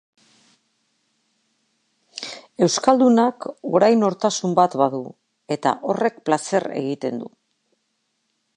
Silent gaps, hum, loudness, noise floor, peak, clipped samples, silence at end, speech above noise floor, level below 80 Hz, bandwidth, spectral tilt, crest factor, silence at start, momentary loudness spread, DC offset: none; none; -20 LUFS; -72 dBFS; -2 dBFS; under 0.1%; 1.3 s; 53 dB; -72 dBFS; 10.5 kHz; -5 dB/octave; 20 dB; 2.15 s; 17 LU; under 0.1%